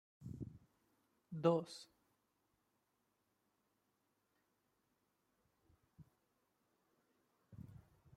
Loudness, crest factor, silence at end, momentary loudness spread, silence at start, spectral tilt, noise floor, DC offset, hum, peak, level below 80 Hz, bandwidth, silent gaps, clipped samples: -41 LUFS; 28 dB; 0.4 s; 24 LU; 0.2 s; -7 dB/octave; -84 dBFS; under 0.1%; none; -22 dBFS; -78 dBFS; 13.5 kHz; none; under 0.1%